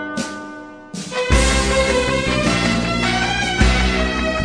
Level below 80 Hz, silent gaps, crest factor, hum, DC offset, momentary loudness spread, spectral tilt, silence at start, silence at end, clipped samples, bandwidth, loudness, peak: -24 dBFS; none; 16 dB; none; under 0.1%; 15 LU; -4 dB/octave; 0 s; 0 s; under 0.1%; 10.5 kHz; -17 LUFS; -2 dBFS